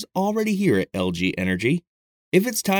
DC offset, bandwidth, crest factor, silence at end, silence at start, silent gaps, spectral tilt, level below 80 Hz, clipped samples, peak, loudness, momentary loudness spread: under 0.1%; 19 kHz; 18 dB; 0 s; 0 s; 1.87-2.32 s; -5 dB/octave; -56 dBFS; under 0.1%; -4 dBFS; -22 LUFS; 4 LU